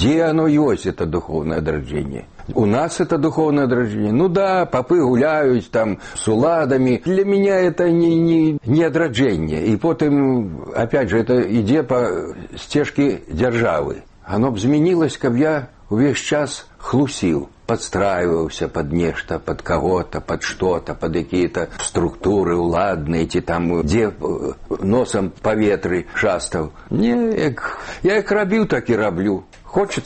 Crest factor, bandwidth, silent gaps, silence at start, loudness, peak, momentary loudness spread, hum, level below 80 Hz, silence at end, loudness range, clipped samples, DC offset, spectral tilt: 14 dB; 8.8 kHz; none; 0 s; -19 LUFS; -4 dBFS; 8 LU; none; -40 dBFS; 0 s; 4 LU; under 0.1%; under 0.1%; -6 dB/octave